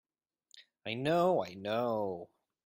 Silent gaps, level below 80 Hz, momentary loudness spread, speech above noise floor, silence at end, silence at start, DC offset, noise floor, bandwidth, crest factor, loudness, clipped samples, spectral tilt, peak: none; -76 dBFS; 14 LU; 45 dB; 0.4 s; 0.55 s; under 0.1%; -78 dBFS; 16 kHz; 18 dB; -33 LUFS; under 0.1%; -6.5 dB/octave; -18 dBFS